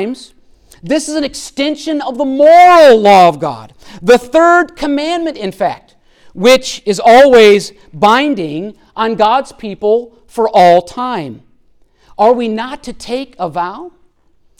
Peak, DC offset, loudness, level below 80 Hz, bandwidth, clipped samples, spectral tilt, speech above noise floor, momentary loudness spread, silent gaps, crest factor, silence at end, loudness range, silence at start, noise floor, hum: 0 dBFS; under 0.1%; -10 LUFS; -46 dBFS; 16.5 kHz; under 0.1%; -4.5 dB/octave; 41 dB; 17 LU; none; 10 dB; 0.7 s; 6 LU; 0 s; -51 dBFS; none